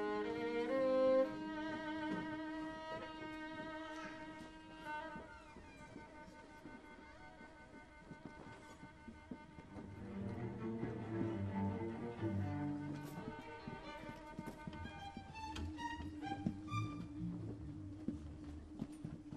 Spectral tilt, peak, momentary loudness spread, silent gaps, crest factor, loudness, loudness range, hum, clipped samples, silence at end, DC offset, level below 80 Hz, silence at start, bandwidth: -7 dB/octave; -24 dBFS; 15 LU; none; 20 dB; -44 LUFS; 16 LU; none; under 0.1%; 0 s; under 0.1%; -62 dBFS; 0 s; 13 kHz